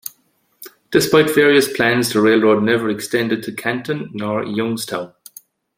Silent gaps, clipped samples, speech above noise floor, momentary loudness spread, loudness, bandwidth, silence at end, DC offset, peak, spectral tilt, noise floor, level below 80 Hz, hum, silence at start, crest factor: none; under 0.1%; 45 dB; 12 LU; -17 LUFS; 16.5 kHz; 0.7 s; under 0.1%; -2 dBFS; -4.5 dB/octave; -61 dBFS; -58 dBFS; none; 0.6 s; 16 dB